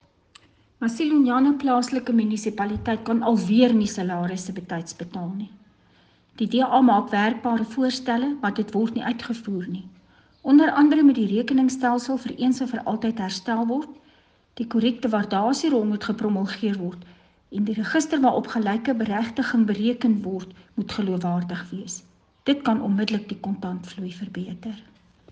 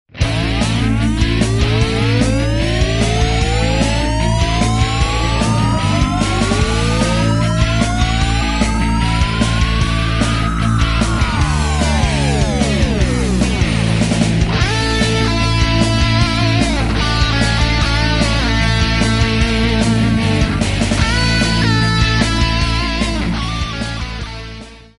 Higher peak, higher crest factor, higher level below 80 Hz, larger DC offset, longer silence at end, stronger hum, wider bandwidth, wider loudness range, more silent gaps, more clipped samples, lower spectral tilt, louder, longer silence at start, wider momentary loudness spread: second, -6 dBFS vs 0 dBFS; about the same, 18 dB vs 14 dB; second, -60 dBFS vs -20 dBFS; second, under 0.1% vs 0.2%; first, 0.5 s vs 0.2 s; neither; second, 9.4 kHz vs 11.5 kHz; first, 6 LU vs 1 LU; neither; neither; about the same, -5.5 dB/octave vs -5 dB/octave; second, -23 LUFS vs -15 LUFS; first, 0.8 s vs 0.15 s; first, 15 LU vs 3 LU